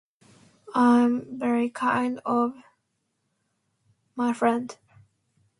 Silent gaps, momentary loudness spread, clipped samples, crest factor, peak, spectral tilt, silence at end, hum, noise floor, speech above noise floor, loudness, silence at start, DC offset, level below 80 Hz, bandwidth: none; 11 LU; under 0.1%; 18 dB; -8 dBFS; -6 dB/octave; 0.85 s; none; -76 dBFS; 53 dB; -24 LUFS; 0.7 s; under 0.1%; -72 dBFS; 11 kHz